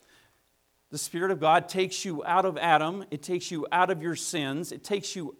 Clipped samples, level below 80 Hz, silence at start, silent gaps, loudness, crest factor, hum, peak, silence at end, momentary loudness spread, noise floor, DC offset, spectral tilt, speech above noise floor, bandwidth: under 0.1%; -76 dBFS; 0.9 s; none; -27 LUFS; 20 dB; none; -8 dBFS; 0.05 s; 10 LU; -70 dBFS; under 0.1%; -3.5 dB/octave; 43 dB; 17 kHz